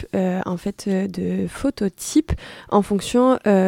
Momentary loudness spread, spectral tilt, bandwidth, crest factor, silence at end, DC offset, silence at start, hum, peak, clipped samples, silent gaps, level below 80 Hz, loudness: 9 LU; -6 dB/octave; 16 kHz; 18 dB; 0 s; under 0.1%; 0 s; none; -4 dBFS; under 0.1%; none; -40 dBFS; -22 LUFS